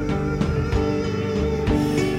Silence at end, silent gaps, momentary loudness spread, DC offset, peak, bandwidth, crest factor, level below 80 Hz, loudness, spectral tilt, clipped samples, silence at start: 0 s; none; 3 LU; under 0.1%; -8 dBFS; 16 kHz; 14 dB; -30 dBFS; -23 LUFS; -7 dB/octave; under 0.1%; 0 s